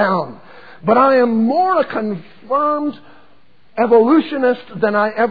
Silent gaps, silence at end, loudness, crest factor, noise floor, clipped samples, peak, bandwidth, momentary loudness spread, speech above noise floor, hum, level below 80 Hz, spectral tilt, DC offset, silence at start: none; 0 s; -16 LUFS; 14 dB; -54 dBFS; under 0.1%; -2 dBFS; 5 kHz; 13 LU; 39 dB; none; -64 dBFS; -9 dB/octave; 0.8%; 0 s